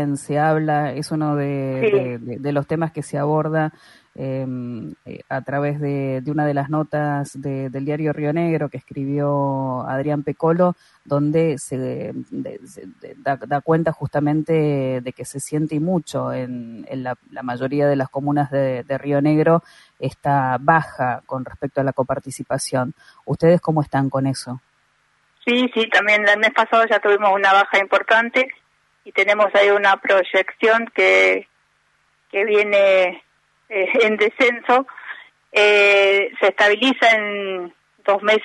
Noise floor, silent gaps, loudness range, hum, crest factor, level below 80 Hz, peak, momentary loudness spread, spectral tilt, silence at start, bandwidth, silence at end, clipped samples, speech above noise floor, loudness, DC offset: -63 dBFS; none; 8 LU; none; 18 dB; -60 dBFS; -2 dBFS; 14 LU; -5.5 dB/octave; 0 s; 11.5 kHz; 0 s; under 0.1%; 44 dB; -19 LUFS; under 0.1%